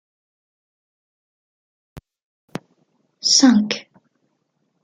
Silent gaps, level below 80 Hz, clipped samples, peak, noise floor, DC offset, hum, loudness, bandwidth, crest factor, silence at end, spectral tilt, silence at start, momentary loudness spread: 2.23-2.48 s; -64 dBFS; under 0.1%; -2 dBFS; -70 dBFS; under 0.1%; none; -16 LUFS; 11 kHz; 22 dB; 1.05 s; -2.5 dB/octave; 1.95 s; 24 LU